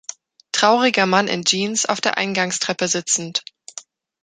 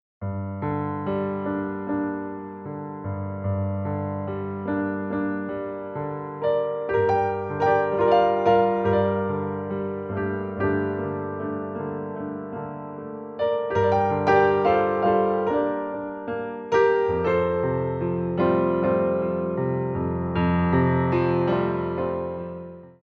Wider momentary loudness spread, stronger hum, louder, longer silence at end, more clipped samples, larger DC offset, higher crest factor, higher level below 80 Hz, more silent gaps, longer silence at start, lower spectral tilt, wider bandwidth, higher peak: first, 20 LU vs 12 LU; neither; first, -18 LUFS vs -24 LUFS; first, 0.4 s vs 0.15 s; neither; neither; about the same, 20 dB vs 18 dB; second, -68 dBFS vs -50 dBFS; neither; about the same, 0.1 s vs 0.2 s; second, -2 dB/octave vs -9 dB/octave; first, 9.6 kHz vs 6.6 kHz; first, 0 dBFS vs -6 dBFS